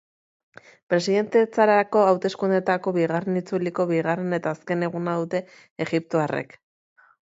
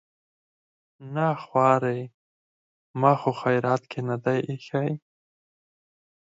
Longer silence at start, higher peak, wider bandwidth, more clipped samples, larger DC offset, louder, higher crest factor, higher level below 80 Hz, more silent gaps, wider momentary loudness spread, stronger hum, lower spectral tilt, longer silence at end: about the same, 0.9 s vs 1 s; about the same, -4 dBFS vs -4 dBFS; about the same, 8 kHz vs 7.8 kHz; neither; neither; about the same, -23 LUFS vs -25 LUFS; about the same, 20 dB vs 22 dB; about the same, -72 dBFS vs -74 dBFS; second, 5.71-5.76 s vs 2.14-2.94 s; second, 9 LU vs 13 LU; neither; second, -6.5 dB/octave vs -8 dB/octave; second, 0.8 s vs 1.35 s